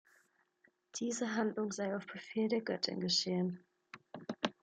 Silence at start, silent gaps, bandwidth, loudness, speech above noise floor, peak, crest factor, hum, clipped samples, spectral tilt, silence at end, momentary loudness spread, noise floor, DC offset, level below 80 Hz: 0.95 s; none; 9.4 kHz; -37 LUFS; 38 dB; -16 dBFS; 22 dB; none; under 0.1%; -4 dB/octave; 0.1 s; 17 LU; -74 dBFS; under 0.1%; -84 dBFS